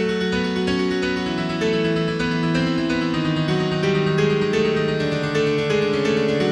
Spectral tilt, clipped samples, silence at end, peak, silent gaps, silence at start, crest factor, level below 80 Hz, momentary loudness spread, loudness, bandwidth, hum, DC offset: -6 dB/octave; under 0.1%; 0 s; -8 dBFS; none; 0 s; 14 dB; -46 dBFS; 3 LU; -21 LUFS; 10.5 kHz; none; under 0.1%